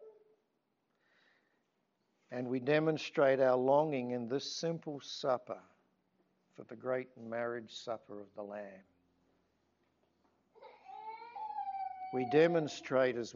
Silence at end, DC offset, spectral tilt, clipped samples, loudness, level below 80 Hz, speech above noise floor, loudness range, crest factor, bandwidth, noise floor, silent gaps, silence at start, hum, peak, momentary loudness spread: 0 s; under 0.1%; -4.5 dB/octave; under 0.1%; -35 LUFS; -86 dBFS; 47 dB; 16 LU; 20 dB; 7.4 kHz; -81 dBFS; none; 0 s; none; -16 dBFS; 19 LU